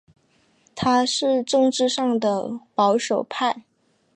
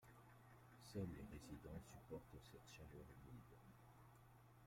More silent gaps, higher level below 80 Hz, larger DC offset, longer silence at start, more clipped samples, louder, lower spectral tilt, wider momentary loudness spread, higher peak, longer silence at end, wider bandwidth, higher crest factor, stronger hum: neither; first, -64 dBFS vs -70 dBFS; neither; first, 0.75 s vs 0 s; neither; first, -21 LUFS vs -60 LUFS; second, -3.5 dB/octave vs -6 dB/octave; second, 8 LU vs 15 LU; first, -8 dBFS vs -38 dBFS; first, 0.55 s vs 0 s; second, 10.5 kHz vs 16.5 kHz; second, 14 dB vs 20 dB; neither